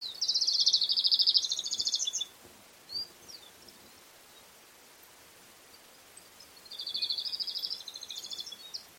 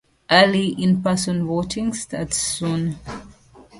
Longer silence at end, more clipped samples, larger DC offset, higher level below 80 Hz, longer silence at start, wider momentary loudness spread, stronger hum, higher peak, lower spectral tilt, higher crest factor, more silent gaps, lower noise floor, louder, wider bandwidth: about the same, 0.05 s vs 0 s; neither; neither; second, -78 dBFS vs -48 dBFS; second, 0 s vs 0.3 s; first, 20 LU vs 13 LU; neither; second, -10 dBFS vs 0 dBFS; second, 2.5 dB/octave vs -4.5 dB/octave; about the same, 24 dB vs 22 dB; neither; first, -56 dBFS vs -47 dBFS; second, -29 LUFS vs -20 LUFS; first, 16.5 kHz vs 11.5 kHz